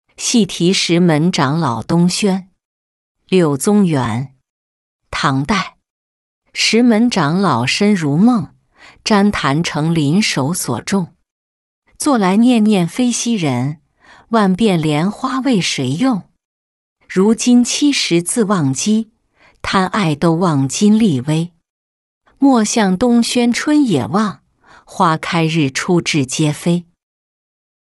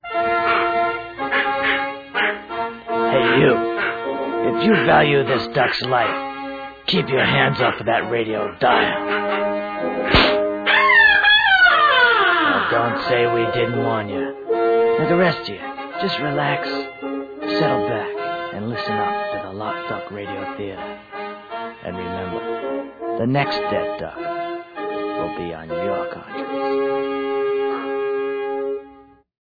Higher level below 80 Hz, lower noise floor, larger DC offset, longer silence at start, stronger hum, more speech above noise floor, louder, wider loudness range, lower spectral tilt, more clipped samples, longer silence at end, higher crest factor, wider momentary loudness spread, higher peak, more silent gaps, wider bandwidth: about the same, -50 dBFS vs -46 dBFS; first, -53 dBFS vs -47 dBFS; neither; first, 0.2 s vs 0.05 s; neither; first, 39 dB vs 27 dB; first, -15 LUFS vs -19 LUFS; second, 3 LU vs 12 LU; second, -5 dB/octave vs -7 dB/octave; neither; first, 1.1 s vs 0.5 s; about the same, 14 dB vs 18 dB; second, 8 LU vs 15 LU; about the same, -2 dBFS vs -2 dBFS; first, 2.65-3.15 s, 4.50-4.99 s, 5.90-6.42 s, 11.31-11.82 s, 16.45-16.96 s, 21.70-22.21 s vs none; first, 12 kHz vs 5 kHz